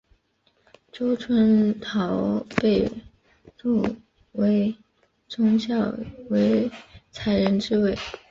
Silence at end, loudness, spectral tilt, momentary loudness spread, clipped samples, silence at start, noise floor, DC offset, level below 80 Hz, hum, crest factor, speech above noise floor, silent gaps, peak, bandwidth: 0.15 s; -23 LUFS; -7.5 dB/octave; 15 LU; under 0.1%; 0.95 s; -67 dBFS; under 0.1%; -52 dBFS; none; 22 dB; 44 dB; none; -2 dBFS; 7.4 kHz